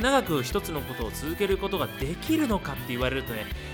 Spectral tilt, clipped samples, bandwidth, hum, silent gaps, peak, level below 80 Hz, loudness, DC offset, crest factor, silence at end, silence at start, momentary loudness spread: -5 dB/octave; under 0.1%; over 20 kHz; none; none; -10 dBFS; -40 dBFS; -28 LUFS; under 0.1%; 16 dB; 0 s; 0 s; 8 LU